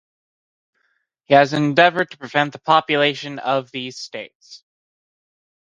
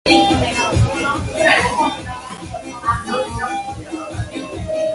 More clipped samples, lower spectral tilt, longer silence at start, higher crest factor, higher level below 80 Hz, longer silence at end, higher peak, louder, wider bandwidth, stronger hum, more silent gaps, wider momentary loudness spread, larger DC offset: neither; about the same, -5 dB/octave vs -4.5 dB/octave; first, 1.3 s vs 0.05 s; about the same, 20 dB vs 18 dB; second, -66 dBFS vs -34 dBFS; first, 1.2 s vs 0 s; about the same, 0 dBFS vs 0 dBFS; about the same, -18 LUFS vs -18 LUFS; second, 9.4 kHz vs 11.5 kHz; neither; first, 4.35-4.40 s vs none; about the same, 16 LU vs 16 LU; neither